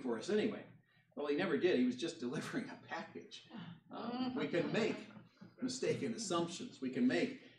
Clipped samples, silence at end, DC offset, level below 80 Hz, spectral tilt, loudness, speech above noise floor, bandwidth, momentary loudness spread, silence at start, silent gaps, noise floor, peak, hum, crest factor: under 0.1%; 0.1 s; under 0.1%; -86 dBFS; -5 dB/octave; -39 LUFS; 20 dB; 11.5 kHz; 17 LU; 0 s; none; -58 dBFS; -22 dBFS; none; 18 dB